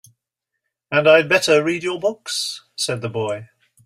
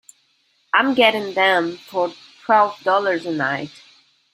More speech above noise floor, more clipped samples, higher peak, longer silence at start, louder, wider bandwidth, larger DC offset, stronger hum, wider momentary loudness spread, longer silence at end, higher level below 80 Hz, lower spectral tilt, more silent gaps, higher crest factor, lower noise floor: first, 62 dB vs 44 dB; neither; about the same, -2 dBFS vs -2 dBFS; first, 0.9 s vs 0.75 s; about the same, -18 LUFS vs -19 LUFS; about the same, 15.5 kHz vs 16 kHz; neither; neither; about the same, 12 LU vs 10 LU; second, 0.4 s vs 0.65 s; first, -64 dBFS vs -70 dBFS; about the same, -3.5 dB/octave vs -4.5 dB/octave; neither; about the same, 20 dB vs 20 dB; first, -80 dBFS vs -63 dBFS